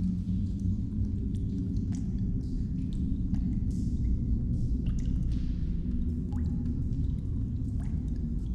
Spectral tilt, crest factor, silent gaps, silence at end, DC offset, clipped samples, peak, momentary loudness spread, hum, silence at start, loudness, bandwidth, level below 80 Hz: -9.5 dB/octave; 12 dB; none; 0 s; under 0.1%; under 0.1%; -18 dBFS; 2 LU; none; 0 s; -32 LUFS; 8.2 kHz; -32 dBFS